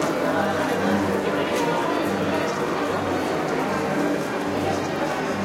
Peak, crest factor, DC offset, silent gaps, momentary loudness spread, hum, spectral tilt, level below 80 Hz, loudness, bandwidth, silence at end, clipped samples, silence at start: -10 dBFS; 14 dB; under 0.1%; none; 3 LU; none; -5 dB/octave; -56 dBFS; -23 LUFS; 16.5 kHz; 0 s; under 0.1%; 0 s